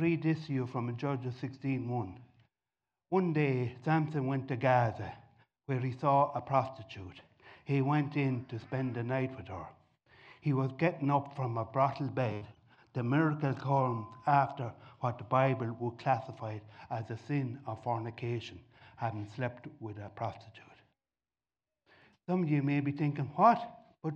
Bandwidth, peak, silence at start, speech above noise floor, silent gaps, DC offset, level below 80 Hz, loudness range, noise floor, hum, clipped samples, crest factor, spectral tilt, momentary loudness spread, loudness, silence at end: 7 kHz; -14 dBFS; 0 s; over 57 dB; none; under 0.1%; -72 dBFS; 7 LU; under -90 dBFS; none; under 0.1%; 20 dB; -9 dB/octave; 15 LU; -33 LUFS; 0 s